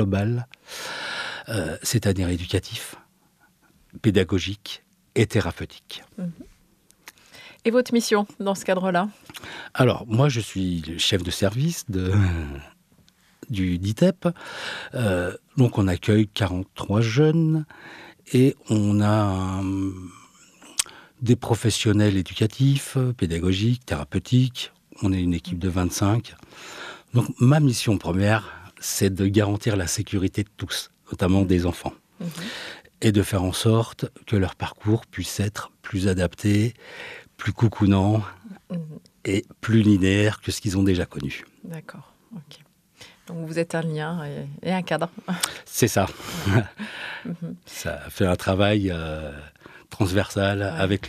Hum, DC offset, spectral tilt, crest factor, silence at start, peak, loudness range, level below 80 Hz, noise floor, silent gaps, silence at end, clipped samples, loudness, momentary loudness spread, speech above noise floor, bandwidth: none; under 0.1%; -5.5 dB/octave; 24 dB; 0 s; 0 dBFS; 5 LU; -48 dBFS; -61 dBFS; none; 0 s; under 0.1%; -24 LUFS; 16 LU; 38 dB; 14.5 kHz